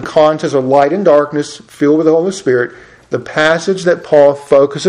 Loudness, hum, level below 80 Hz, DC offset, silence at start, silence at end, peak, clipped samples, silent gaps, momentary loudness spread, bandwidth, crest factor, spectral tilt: -12 LUFS; none; -54 dBFS; under 0.1%; 0 s; 0 s; 0 dBFS; 0.4%; none; 10 LU; 11 kHz; 12 dB; -5.5 dB/octave